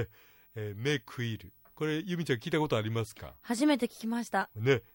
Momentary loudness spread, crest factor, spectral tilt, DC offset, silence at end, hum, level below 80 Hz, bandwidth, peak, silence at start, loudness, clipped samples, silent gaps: 13 LU; 20 dB; -5.5 dB/octave; under 0.1%; 0.15 s; none; -66 dBFS; 16.5 kHz; -14 dBFS; 0 s; -33 LUFS; under 0.1%; none